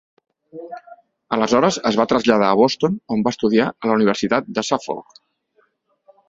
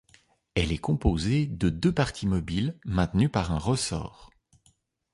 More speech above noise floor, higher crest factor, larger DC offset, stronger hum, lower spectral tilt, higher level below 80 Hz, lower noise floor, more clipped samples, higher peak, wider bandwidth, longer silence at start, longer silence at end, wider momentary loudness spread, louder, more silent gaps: first, 45 dB vs 40 dB; about the same, 20 dB vs 18 dB; neither; neither; about the same, -5 dB/octave vs -6 dB/octave; second, -58 dBFS vs -40 dBFS; second, -63 dBFS vs -67 dBFS; neither; first, 0 dBFS vs -10 dBFS; second, 7.8 kHz vs 11.5 kHz; about the same, 0.55 s vs 0.55 s; first, 1.25 s vs 0.9 s; first, 18 LU vs 5 LU; first, -18 LUFS vs -27 LUFS; neither